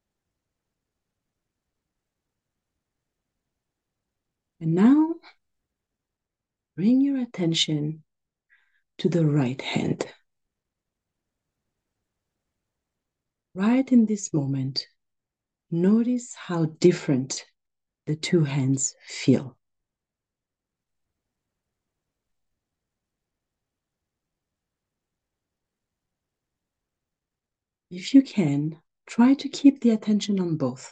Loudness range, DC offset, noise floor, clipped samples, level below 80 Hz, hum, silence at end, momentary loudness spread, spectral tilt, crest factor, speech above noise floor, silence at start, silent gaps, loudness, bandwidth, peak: 7 LU; under 0.1%; -88 dBFS; under 0.1%; -74 dBFS; none; 0.05 s; 13 LU; -5.5 dB/octave; 22 dB; 66 dB; 4.6 s; none; -23 LUFS; 9.2 kHz; -6 dBFS